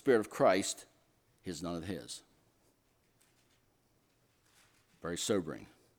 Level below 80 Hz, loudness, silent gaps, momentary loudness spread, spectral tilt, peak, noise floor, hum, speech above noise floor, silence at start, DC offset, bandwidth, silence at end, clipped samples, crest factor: -70 dBFS; -35 LUFS; none; 18 LU; -4 dB/octave; -14 dBFS; -73 dBFS; none; 39 dB; 0.05 s; under 0.1%; 19 kHz; 0.35 s; under 0.1%; 24 dB